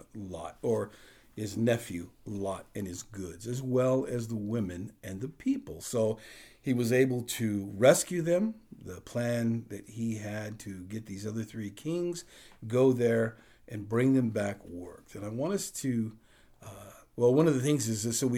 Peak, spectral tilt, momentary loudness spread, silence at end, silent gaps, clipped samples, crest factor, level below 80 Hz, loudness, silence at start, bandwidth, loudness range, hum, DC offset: -8 dBFS; -5.5 dB/octave; 17 LU; 0 s; none; under 0.1%; 22 dB; -64 dBFS; -31 LUFS; 0.15 s; 18 kHz; 6 LU; none; under 0.1%